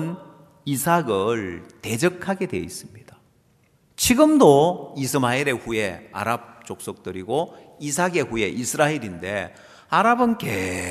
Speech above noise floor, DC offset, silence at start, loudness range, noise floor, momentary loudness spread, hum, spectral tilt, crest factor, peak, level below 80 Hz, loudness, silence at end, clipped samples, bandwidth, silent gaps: 39 dB; under 0.1%; 0 s; 6 LU; -60 dBFS; 17 LU; none; -4.5 dB/octave; 22 dB; 0 dBFS; -54 dBFS; -22 LUFS; 0 s; under 0.1%; 14 kHz; none